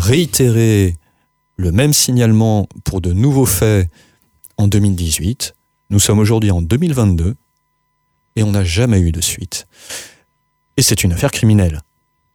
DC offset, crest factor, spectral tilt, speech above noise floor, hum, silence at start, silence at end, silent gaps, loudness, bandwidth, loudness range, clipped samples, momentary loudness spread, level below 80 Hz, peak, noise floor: under 0.1%; 14 dB; -5 dB/octave; 52 dB; none; 0 s; 0.55 s; none; -14 LUFS; 19 kHz; 3 LU; under 0.1%; 14 LU; -32 dBFS; 0 dBFS; -65 dBFS